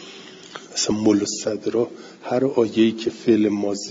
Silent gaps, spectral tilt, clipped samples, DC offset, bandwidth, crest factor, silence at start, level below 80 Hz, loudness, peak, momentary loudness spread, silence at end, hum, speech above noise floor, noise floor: none; -4.5 dB/octave; under 0.1%; under 0.1%; 7.8 kHz; 16 dB; 0 s; -62 dBFS; -21 LUFS; -6 dBFS; 19 LU; 0 s; none; 20 dB; -41 dBFS